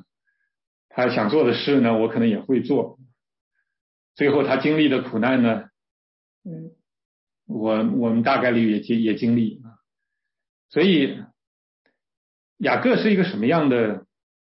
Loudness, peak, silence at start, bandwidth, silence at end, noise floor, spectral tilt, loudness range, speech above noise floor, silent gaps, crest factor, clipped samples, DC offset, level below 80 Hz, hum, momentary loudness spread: -21 LUFS; -8 dBFS; 0.95 s; 5.8 kHz; 0.5 s; -83 dBFS; -10.5 dB/octave; 3 LU; 63 dB; 3.41-3.51 s, 3.81-4.15 s, 5.91-6.42 s, 7.05-7.27 s, 10.49-10.69 s, 11.47-11.85 s, 12.17-12.56 s; 16 dB; under 0.1%; under 0.1%; -68 dBFS; none; 10 LU